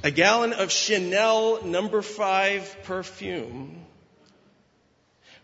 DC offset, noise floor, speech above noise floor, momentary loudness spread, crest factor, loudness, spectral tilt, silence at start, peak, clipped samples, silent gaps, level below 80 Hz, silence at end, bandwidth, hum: under 0.1%; -65 dBFS; 40 dB; 14 LU; 24 dB; -24 LUFS; -2.5 dB/octave; 0 s; -2 dBFS; under 0.1%; none; -64 dBFS; 1.6 s; 8 kHz; none